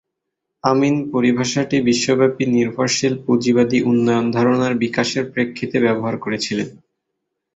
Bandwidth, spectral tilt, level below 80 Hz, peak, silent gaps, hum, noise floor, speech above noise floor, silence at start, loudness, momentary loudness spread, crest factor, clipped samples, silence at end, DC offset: 8 kHz; -5 dB/octave; -56 dBFS; -2 dBFS; none; none; -79 dBFS; 61 dB; 0.65 s; -18 LUFS; 6 LU; 16 dB; under 0.1%; 0.85 s; under 0.1%